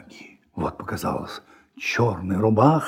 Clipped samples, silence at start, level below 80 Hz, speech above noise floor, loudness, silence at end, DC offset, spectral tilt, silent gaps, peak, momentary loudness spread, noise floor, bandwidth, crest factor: under 0.1%; 0.15 s; -52 dBFS; 25 dB; -24 LUFS; 0 s; under 0.1%; -7 dB/octave; none; -4 dBFS; 21 LU; -47 dBFS; 16.5 kHz; 20 dB